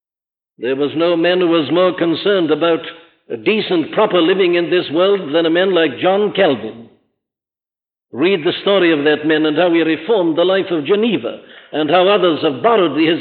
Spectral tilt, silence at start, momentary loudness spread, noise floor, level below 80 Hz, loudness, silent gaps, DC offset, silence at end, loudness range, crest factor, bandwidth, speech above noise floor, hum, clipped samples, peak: -10 dB/octave; 0.6 s; 8 LU; under -90 dBFS; -66 dBFS; -15 LUFS; none; under 0.1%; 0 s; 3 LU; 12 dB; 4.6 kHz; over 76 dB; none; under 0.1%; -2 dBFS